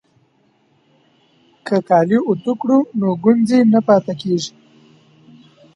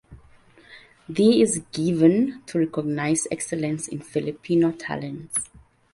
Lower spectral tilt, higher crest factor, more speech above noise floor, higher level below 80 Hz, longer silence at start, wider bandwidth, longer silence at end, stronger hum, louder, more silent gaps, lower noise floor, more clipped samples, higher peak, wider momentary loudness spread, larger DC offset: first, -7 dB/octave vs -5 dB/octave; about the same, 18 dB vs 18 dB; first, 44 dB vs 30 dB; second, -66 dBFS vs -58 dBFS; first, 1.65 s vs 0.1 s; about the same, 11 kHz vs 11.5 kHz; first, 1.3 s vs 0.5 s; neither; first, -16 LUFS vs -23 LUFS; neither; first, -59 dBFS vs -53 dBFS; neither; first, 0 dBFS vs -6 dBFS; second, 8 LU vs 12 LU; neither